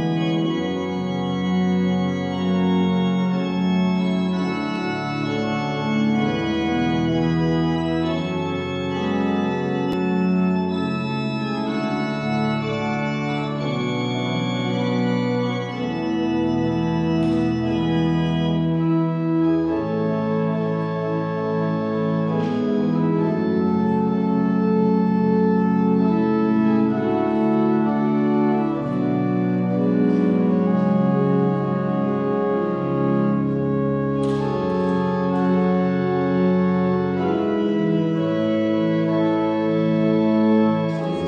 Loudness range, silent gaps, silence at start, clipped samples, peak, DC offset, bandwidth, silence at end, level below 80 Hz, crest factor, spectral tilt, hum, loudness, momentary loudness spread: 3 LU; none; 0 s; under 0.1%; -8 dBFS; under 0.1%; 7.4 kHz; 0 s; -54 dBFS; 12 dB; -8 dB/octave; none; -21 LUFS; 5 LU